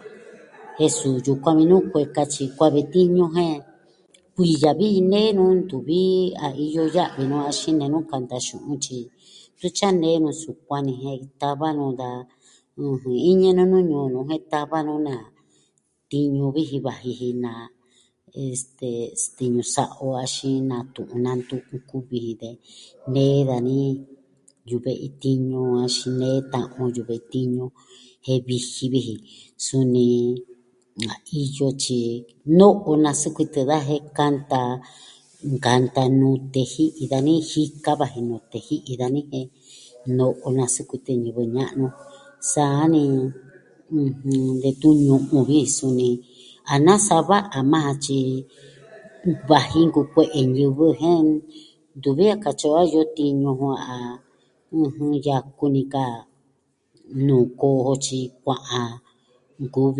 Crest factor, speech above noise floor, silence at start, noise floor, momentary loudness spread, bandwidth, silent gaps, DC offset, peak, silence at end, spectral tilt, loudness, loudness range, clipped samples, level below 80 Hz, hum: 22 dB; 46 dB; 0.05 s; -67 dBFS; 13 LU; 11.5 kHz; none; under 0.1%; 0 dBFS; 0 s; -6 dB/octave; -21 LUFS; 6 LU; under 0.1%; -60 dBFS; none